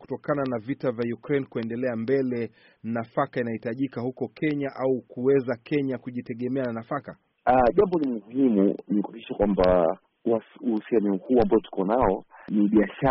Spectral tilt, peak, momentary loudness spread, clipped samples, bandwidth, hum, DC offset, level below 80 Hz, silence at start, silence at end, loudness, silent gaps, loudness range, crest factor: -7 dB/octave; -10 dBFS; 11 LU; under 0.1%; 5.8 kHz; none; under 0.1%; -48 dBFS; 0 s; 0 s; -26 LUFS; none; 5 LU; 16 dB